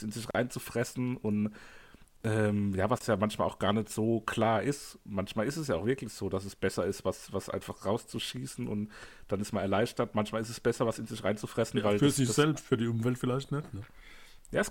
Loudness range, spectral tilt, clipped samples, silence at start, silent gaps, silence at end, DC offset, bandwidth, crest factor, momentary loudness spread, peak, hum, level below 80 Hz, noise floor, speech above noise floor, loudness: 5 LU; -5.5 dB/octave; under 0.1%; 0 s; none; 0 s; under 0.1%; 17 kHz; 20 dB; 9 LU; -12 dBFS; none; -58 dBFS; -52 dBFS; 20 dB; -32 LUFS